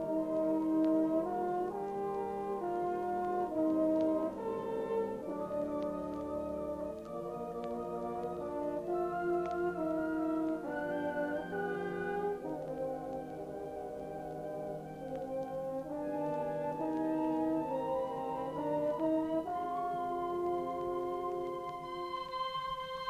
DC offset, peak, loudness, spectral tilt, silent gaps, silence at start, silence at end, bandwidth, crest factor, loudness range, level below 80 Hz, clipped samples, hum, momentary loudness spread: under 0.1%; -22 dBFS; -36 LUFS; -7 dB/octave; none; 0 s; 0 s; 15 kHz; 14 dB; 5 LU; -64 dBFS; under 0.1%; none; 9 LU